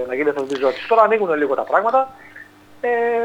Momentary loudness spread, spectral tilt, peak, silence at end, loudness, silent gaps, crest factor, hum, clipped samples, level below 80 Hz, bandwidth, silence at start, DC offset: 7 LU; -5.5 dB/octave; -2 dBFS; 0 s; -18 LUFS; none; 18 dB; 50 Hz at -55 dBFS; under 0.1%; -66 dBFS; 9.2 kHz; 0 s; under 0.1%